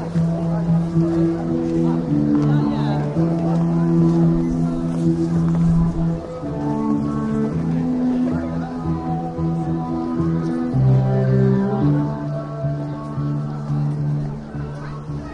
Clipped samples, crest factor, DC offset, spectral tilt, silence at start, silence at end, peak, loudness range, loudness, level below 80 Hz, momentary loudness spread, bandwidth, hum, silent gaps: under 0.1%; 12 dB; under 0.1%; -9.5 dB/octave; 0 s; 0 s; -6 dBFS; 4 LU; -20 LUFS; -38 dBFS; 8 LU; 7.4 kHz; none; none